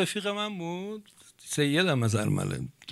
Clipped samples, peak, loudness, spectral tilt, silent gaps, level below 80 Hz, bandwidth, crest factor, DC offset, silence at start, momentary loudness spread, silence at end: under 0.1%; -12 dBFS; -29 LUFS; -5 dB/octave; none; -62 dBFS; 15 kHz; 18 dB; under 0.1%; 0 s; 14 LU; 0 s